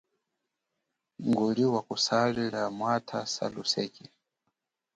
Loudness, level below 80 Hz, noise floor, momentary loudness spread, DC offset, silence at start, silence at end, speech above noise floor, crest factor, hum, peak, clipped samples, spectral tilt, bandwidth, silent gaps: -29 LUFS; -70 dBFS; -84 dBFS; 8 LU; under 0.1%; 1.2 s; 0.95 s; 55 dB; 18 dB; none; -12 dBFS; under 0.1%; -4.5 dB/octave; 9.2 kHz; none